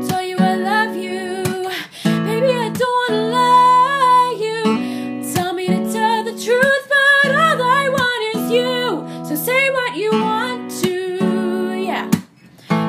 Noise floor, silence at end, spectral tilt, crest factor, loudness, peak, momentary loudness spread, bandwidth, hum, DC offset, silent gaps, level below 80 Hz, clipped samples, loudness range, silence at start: -42 dBFS; 0 s; -4.5 dB/octave; 16 dB; -17 LUFS; 0 dBFS; 10 LU; 15.5 kHz; none; under 0.1%; none; -62 dBFS; under 0.1%; 4 LU; 0 s